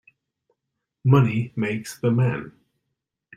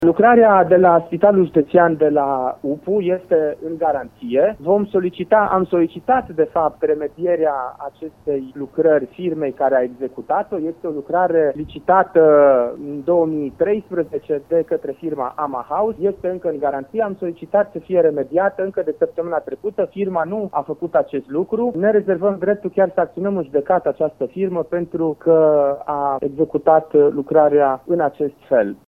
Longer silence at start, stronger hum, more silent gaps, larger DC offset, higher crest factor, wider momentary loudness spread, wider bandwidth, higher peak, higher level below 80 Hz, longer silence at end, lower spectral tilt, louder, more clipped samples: first, 1.05 s vs 0 s; neither; neither; neither; about the same, 20 dB vs 18 dB; about the same, 9 LU vs 11 LU; first, 13.5 kHz vs 3.9 kHz; second, -4 dBFS vs 0 dBFS; about the same, -58 dBFS vs -56 dBFS; first, 0.85 s vs 0.15 s; second, -7.5 dB/octave vs -9.5 dB/octave; second, -22 LUFS vs -18 LUFS; neither